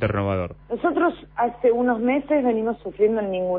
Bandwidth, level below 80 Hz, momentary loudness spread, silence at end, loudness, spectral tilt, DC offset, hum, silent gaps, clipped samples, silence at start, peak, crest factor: 4.3 kHz; -48 dBFS; 5 LU; 0 s; -22 LUFS; -11.5 dB/octave; under 0.1%; none; none; under 0.1%; 0 s; -8 dBFS; 14 dB